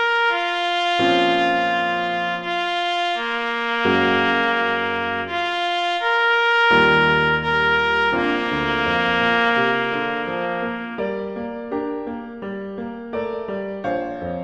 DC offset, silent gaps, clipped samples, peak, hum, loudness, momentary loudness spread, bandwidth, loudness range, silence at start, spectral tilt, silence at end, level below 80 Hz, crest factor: under 0.1%; none; under 0.1%; -4 dBFS; none; -20 LUFS; 11 LU; 10 kHz; 10 LU; 0 s; -5 dB/octave; 0 s; -50 dBFS; 18 dB